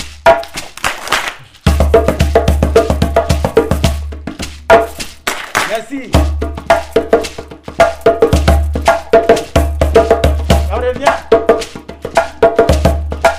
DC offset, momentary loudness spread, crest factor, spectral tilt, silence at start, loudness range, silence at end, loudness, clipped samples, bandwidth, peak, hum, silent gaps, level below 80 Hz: under 0.1%; 11 LU; 12 dB; -5.5 dB/octave; 0 s; 3 LU; 0 s; -13 LUFS; 0.5%; 16 kHz; 0 dBFS; none; none; -20 dBFS